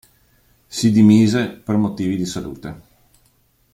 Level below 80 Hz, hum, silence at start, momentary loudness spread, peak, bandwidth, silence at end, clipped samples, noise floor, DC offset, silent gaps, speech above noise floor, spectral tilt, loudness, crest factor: -52 dBFS; none; 0.7 s; 19 LU; -2 dBFS; 14.5 kHz; 0.95 s; under 0.1%; -60 dBFS; under 0.1%; none; 43 dB; -6 dB/octave; -17 LUFS; 16 dB